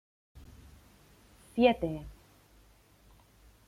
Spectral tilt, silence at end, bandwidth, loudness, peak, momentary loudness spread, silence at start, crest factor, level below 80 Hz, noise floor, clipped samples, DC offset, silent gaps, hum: -6.5 dB/octave; 1.55 s; 15.5 kHz; -30 LUFS; -10 dBFS; 28 LU; 1.55 s; 26 dB; -56 dBFS; -62 dBFS; under 0.1%; under 0.1%; none; none